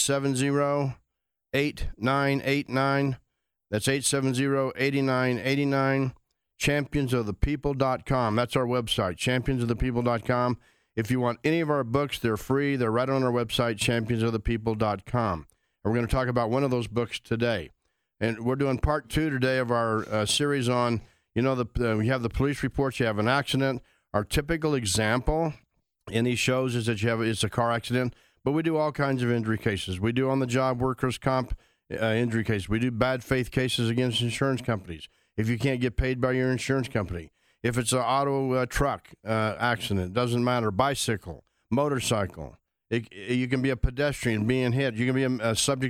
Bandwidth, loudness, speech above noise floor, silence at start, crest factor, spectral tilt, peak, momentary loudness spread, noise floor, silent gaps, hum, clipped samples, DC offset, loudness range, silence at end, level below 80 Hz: 16.5 kHz; -27 LUFS; 57 dB; 0 s; 20 dB; -5 dB/octave; -8 dBFS; 7 LU; -83 dBFS; none; none; under 0.1%; under 0.1%; 2 LU; 0 s; -42 dBFS